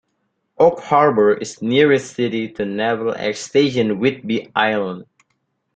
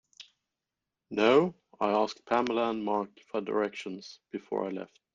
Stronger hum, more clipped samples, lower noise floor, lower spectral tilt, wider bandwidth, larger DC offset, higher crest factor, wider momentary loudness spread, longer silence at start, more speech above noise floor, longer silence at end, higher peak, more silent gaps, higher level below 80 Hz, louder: neither; neither; second, -70 dBFS vs -88 dBFS; about the same, -5.5 dB/octave vs -5.5 dB/octave; first, 9.2 kHz vs 7.6 kHz; neither; about the same, 16 dB vs 20 dB; second, 9 LU vs 17 LU; first, 0.6 s vs 0.2 s; second, 53 dB vs 59 dB; first, 0.75 s vs 0.3 s; first, -2 dBFS vs -10 dBFS; neither; first, -60 dBFS vs -72 dBFS; first, -18 LUFS vs -30 LUFS